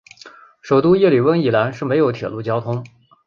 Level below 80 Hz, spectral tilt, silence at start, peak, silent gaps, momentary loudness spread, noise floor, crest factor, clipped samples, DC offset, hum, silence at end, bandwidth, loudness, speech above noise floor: -56 dBFS; -8 dB/octave; 0.25 s; -4 dBFS; none; 11 LU; -44 dBFS; 14 dB; under 0.1%; under 0.1%; none; 0.4 s; 7.2 kHz; -17 LUFS; 27 dB